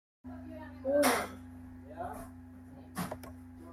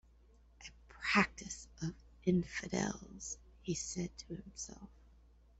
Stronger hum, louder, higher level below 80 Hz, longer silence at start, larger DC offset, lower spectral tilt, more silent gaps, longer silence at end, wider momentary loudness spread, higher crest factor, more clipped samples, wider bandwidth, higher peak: neither; first, -35 LUFS vs -39 LUFS; about the same, -60 dBFS vs -60 dBFS; second, 0.25 s vs 0.6 s; neither; about the same, -4 dB/octave vs -4 dB/octave; neither; second, 0 s vs 0.7 s; about the same, 22 LU vs 22 LU; about the same, 22 dB vs 24 dB; neither; first, 16 kHz vs 8.2 kHz; about the same, -16 dBFS vs -16 dBFS